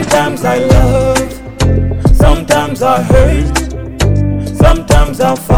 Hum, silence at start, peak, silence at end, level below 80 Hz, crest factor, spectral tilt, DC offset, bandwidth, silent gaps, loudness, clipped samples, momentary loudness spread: none; 0 s; 0 dBFS; 0 s; -14 dBFS; 10 dB; -6 dB/octave; 2%; 19.5 kHz; none; -11 LUFS; 2%; 6 LU